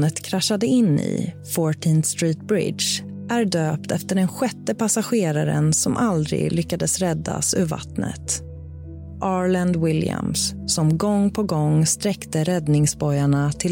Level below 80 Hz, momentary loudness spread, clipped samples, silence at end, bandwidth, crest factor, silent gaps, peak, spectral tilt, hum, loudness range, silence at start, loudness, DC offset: -46 dBFS; 7 LU; under 0.1%; 0 s; 17 kHz; 12 dB; none; -8 dBFS; -5 dB/octave; none; 3 LU; 0 s; -21 LUFS; under 0.1%